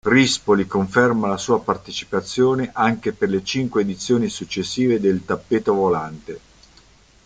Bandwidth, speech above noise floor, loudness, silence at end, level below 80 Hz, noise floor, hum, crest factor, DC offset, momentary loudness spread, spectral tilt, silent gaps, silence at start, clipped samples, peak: 9.4 kHz; 32 dB; -20 LUFS; 0.9 s; -54 dBFS; -52 dBFS; none; 18 dB; under 0.1%; 8 LU; -5 dB/octave; none; 0.05 s; under 0.1%; -2 dBFS